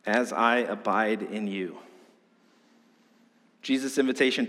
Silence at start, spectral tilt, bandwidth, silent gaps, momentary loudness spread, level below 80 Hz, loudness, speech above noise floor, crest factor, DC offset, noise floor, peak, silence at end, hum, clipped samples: 0.05 s; -4 dB/octave; 14 kHz; none; 13 LU; -86 dBFS; -27 LUFS; 36 dB; 20 dB; under 0.1%; -62 dBFS; -10 dBFS; 0 s; none; under 0.1%